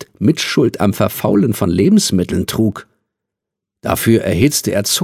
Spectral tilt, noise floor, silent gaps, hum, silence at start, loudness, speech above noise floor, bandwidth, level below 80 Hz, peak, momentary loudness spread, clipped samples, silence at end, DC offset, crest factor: -5 dB/octave; -82 dBFS; none; none; 0 s; -15 LUFS; 68 dB; 16 kHz; -38 dBFS; 0 dBFS; 6 LU; under 0.1%; 0 s; under 0.1%; 16 dB